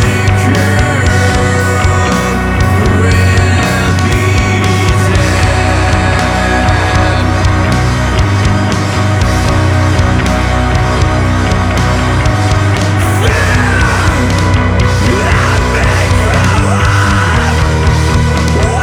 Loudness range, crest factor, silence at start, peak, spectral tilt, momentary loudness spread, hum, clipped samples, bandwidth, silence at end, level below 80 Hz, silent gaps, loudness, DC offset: 1 LU; 10 dB; 0 s; 0 dBFS; -5.5 dB/octave; 2 LU; none; under 0.1%; 15.5 kHz; 0 s; -18 dBFS; none; -10 LUFS; under 0.1%